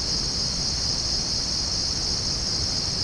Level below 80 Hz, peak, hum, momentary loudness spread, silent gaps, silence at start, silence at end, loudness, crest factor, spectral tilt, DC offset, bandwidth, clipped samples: -36 dBFS; -14 dBFS; none; 1 LU; none; 0 s; 0 s; -23 LUFS; 12 dB; -2 dB/octave; under 0.1%; 10.5 kHz; under 0.1%